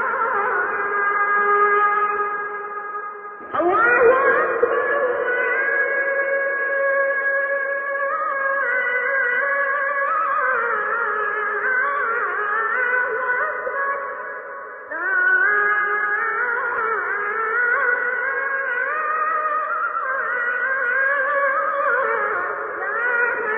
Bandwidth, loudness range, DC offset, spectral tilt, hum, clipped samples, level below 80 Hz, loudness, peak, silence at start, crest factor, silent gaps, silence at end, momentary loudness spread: 3.8 kHz; 2 LU; under 0.1%; -7.5 dB/octave; none; under 0.1%; -66 dBFS; -20 LUFS; -4 dBFS; 0 s; 16 dB; none; 0 s; 8 LU